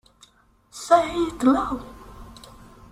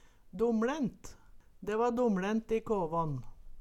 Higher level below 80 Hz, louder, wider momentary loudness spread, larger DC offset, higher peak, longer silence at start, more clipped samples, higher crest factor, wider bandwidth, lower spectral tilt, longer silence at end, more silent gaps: about the same, -48 dBFS vs -52 dBFS; first, -22 LUFS vs -33 LUFS; first, 25 LU vs 14 LU; neither; first, -4 dBFS vs -20 dBFS; first, 0.75 s vs 0.25 s; neither; first, 22 dB vs 14 dB; first, 14.5 kHz vs 13 kHz; second, -5 dB/octave vs -7 dB/octave; first, 0.6 s vs 0 s; neither